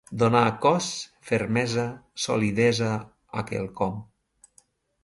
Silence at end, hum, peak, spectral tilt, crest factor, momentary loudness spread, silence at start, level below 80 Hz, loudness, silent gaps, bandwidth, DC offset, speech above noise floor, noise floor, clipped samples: 1 s; none; -6 dBFS; -5 dB/octave; 20 dB; 13 LU; 0.1 s; -56 dBFS; -25 LUFS; none; 11.5 kHz; under 0.1%; 38 dB; -62 dBFS; under 0.1%